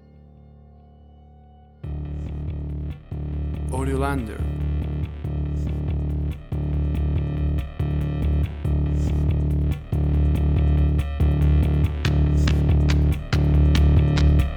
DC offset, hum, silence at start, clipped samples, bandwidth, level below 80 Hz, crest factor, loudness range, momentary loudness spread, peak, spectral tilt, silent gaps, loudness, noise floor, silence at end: under 0.1%; none; 1.85 s; under 0.1%; 9.4 kHz; -24 dBFS; 14 dB; 9 LU; 12 LU; -6 dBFS; -8 dB/octave; none; -23 LUFS; -48 dBFS; 0 s